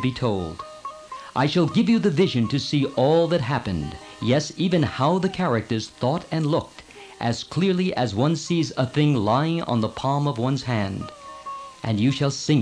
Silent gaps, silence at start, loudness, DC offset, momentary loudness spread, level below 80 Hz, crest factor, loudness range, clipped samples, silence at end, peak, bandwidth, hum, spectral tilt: none; 0 s; -23 LUFS; under 0.1%; 15 LU; -52 dBFS; 14 dB; 3 LU; under 0.1%; 0 s; -8 dBFS; 10.5 kHz; none; -6.5 dB/octave